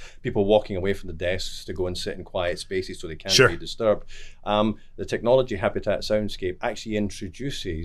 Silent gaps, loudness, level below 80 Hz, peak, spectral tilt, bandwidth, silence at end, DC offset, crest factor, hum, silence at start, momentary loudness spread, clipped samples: none; -25 LUFS; -40 dBFS; -4 dBFS; -4.5 dB/octave; 13.5 kHz; 0 s; under 0.1%; 22 dB; none; 0 s; 11 LU; under 0.1%